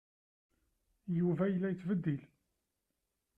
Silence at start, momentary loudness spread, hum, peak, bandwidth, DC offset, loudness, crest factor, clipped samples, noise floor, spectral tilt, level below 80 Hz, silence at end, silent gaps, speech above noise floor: 1.05 s; 9 LU; none; -22 dBFS; 3.5 kHz; under 0.1%; -35 LUFS; 16 dB; under 0.1%; -86 dBFS; -10.5 dB/octave; -74 dBFS; 1.1 s; none; 52 dB